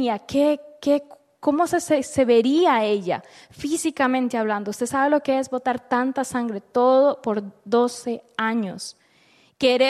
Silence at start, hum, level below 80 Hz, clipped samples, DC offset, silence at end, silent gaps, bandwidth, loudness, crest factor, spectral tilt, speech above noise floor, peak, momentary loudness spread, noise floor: 0 s; none; -62 dBFS; under 0.1%; under 0.1%; 0 s; none; 13.5 kHz; -22 LUFS; 16 dB; -4 dB/octave; 36 dB; -6 dBFS; 9 LU; -58 dBFS